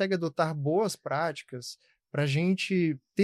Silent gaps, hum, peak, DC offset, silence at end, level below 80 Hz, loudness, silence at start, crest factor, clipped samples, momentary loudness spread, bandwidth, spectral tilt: none; none; -12 dBFS; under 0.1%; 0 s; -72 dBFS; -29 LUFS; 0 s; 16 dB; under 0.1%; 14 LU; 13.5 kHz; -6 dB/octave